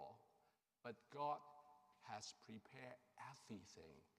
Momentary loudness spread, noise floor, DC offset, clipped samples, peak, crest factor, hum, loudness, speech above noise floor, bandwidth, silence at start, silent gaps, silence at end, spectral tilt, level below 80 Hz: 16 LU; -82 dBFS; under 0.1%; under 0.1%; -34 dBFS; 22 dB; none; -55 LUFS; 28 dB; 14.5 kHz; 0 s; none; 0.15 s; -4 dB/octave; under -90 dBFS